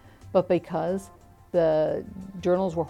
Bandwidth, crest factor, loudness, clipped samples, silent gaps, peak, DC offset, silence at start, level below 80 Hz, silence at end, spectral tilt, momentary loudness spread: 12.5 kHz; 18 dB; -26 LUFS; under 0.1%; none; -8 dBFS; under 0.1%; 0.25 s; -54 dBFS; 0 s; -7.5 dB/octave; 10 LU